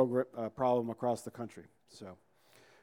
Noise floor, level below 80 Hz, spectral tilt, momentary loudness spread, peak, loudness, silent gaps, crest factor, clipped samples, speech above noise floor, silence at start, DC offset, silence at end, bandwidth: -64 dBFS; -76 dBFS; -7 dB/octave; 20 LU; -14 dBFS; -35 LUFS; none; 20 dB; under 0.1%; 28 dB; 0 s; under 0.1%; 0.7 s; 16.5 kHz